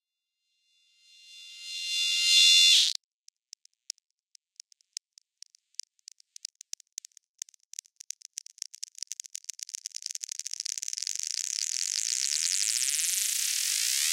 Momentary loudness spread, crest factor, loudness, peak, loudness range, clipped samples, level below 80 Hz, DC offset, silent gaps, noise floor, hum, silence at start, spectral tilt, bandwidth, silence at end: 24 LU; 22 dB; -24 LUFS; -10 dBFS; 21 LU; under 0.1%; under -90 dBFS; under 0.1%; 3.04-3.24 s, 6.92-6.97 s, 7.29-7.35 s; -84 dBFS; none; 1.3 s; 13.5 dB/octave; 17 kHz; 0 s